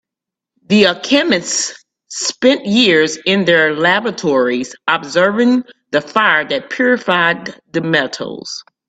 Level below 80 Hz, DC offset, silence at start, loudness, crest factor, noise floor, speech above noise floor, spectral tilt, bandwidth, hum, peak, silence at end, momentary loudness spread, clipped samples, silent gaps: -60 dBFS; under 0.1%; 0.7 s; -14 LUFS; 16 dB; -84 dBFS; 70 dB; -3.5 dB/octave; 9.2 kHz; none; 0 dBFS; 0.25 s; 11 LU; under 0.1%; none